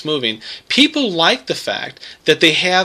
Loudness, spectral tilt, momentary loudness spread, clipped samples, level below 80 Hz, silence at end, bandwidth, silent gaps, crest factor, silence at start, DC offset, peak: -15 LUFS; -3 dB/octave; 12 LU; under 0.1%; -60 dBFS; 0 s; 15 kHz; none; 16 dB; 0 s; under 0.1%; 0 dBFS